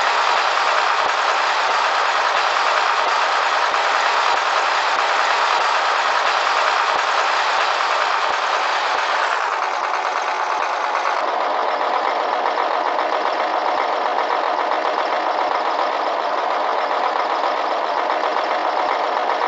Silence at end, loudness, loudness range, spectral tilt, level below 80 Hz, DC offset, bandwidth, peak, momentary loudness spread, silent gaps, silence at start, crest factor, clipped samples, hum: 0 s; -18 LUFS; 3 LU; 3.5 dB/octave; -68 dBFS; under 0.1%; 8 kHz; -4 dBFS; 4 LU; none; 0 s; 16 dB; under 0.1%; none